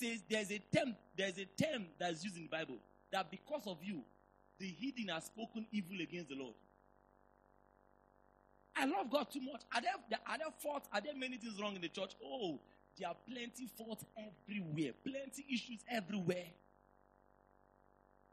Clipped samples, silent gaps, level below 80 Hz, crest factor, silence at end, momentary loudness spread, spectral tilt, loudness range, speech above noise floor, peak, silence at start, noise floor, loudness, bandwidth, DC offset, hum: under 0.1%; none; -78 dBFS; 24 dB; 1.8 s; 11 LU; -4.5 dB/octave; 5 LU; 28 dB; -20 dBFS; 0 s; -71 dBFS; -43 LUFS; 13 kHz; under 0.1%; none